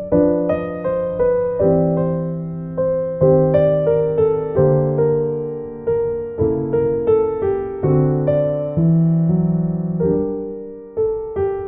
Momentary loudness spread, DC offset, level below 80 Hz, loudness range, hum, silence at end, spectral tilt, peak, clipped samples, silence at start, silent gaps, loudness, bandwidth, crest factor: 8 LU; under 0.1%; -42 dBFS; 2 LU; none; 0 s; -13.5 dB/octave; -4 dBFS; under 0.1%; 0 s; none; -18 LUFS; 3.3 kHz; 14 dB